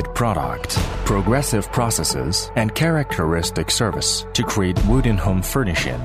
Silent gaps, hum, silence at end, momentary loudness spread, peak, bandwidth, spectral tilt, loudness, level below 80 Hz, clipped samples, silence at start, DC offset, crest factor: none; none; 0 s; 3 LU; -4 dBFS; 16 kHz; -4.5 dB/octave; -20 LUFS; -28 dBFS; under 0.1%; 0 s; under 0.1%; 16 dB